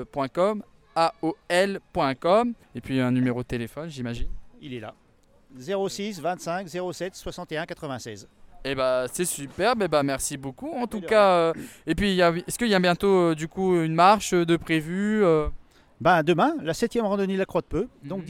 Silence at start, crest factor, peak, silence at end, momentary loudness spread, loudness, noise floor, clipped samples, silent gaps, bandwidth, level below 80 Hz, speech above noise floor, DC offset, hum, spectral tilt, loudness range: 0 s; 20 dB; -6 dBFS; 0 s; 14 LU; -24 LUFS; -57 dBFS; under 0.1%; none; 17 kHz; -46 dBFS; 33 dB; under 0.1%; none; -5 dB/octave; 10 LU